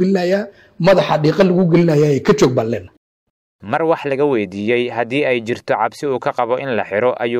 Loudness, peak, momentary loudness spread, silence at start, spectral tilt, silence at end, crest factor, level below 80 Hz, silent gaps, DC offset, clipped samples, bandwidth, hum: -16 LUFS; -2 dBFS; 7 LU; 0 s; -6.5 dB/octave; 0 s; 14 dB; -52 dBFS; 2.97-3.59 s; under 0.1%; under 0.1%; 15 kHz; none